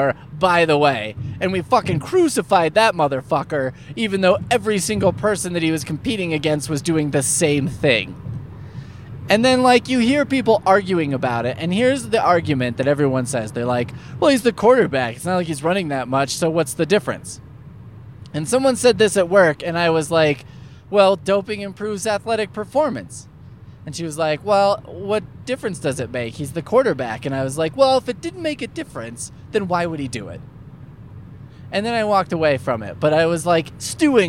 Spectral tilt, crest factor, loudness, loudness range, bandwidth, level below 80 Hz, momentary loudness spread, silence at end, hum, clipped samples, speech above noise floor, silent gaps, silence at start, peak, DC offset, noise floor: -5 dB/octave; 18 dB; -19 LUFS; 5 LU; 17 kHz; -50 dBFS; 13 LU; 0 s; none; under 0.1%; 22 dB; none; 0 s; -2 dBFS; 0.1%; -41 dBFS